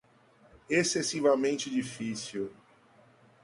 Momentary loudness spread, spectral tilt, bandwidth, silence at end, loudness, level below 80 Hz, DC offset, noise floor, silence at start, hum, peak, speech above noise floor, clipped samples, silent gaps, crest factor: 11 LU; -3.5 dB/octave; 11.5 kHz; 0.9 s; -30 LUFS; -70 dBFS; under 0.1%; -62 dBFS; 0.7 s; none; -12 dBFS; 32 dB; under 0.1%; none; 20 dB